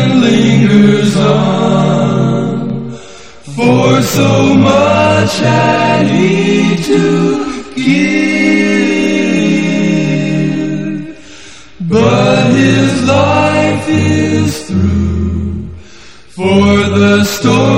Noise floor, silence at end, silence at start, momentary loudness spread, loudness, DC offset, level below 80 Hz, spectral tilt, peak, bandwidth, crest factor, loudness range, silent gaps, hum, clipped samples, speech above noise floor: -37 dBFS; 0 s; 0 s; 9 LU; -10 LUFS; 2%; -34 dBFS; -6 dB/octave; 0 dBFS; 16.5 kHz; 10 dB; 3 LU; none; none; 0.2%; 28 dB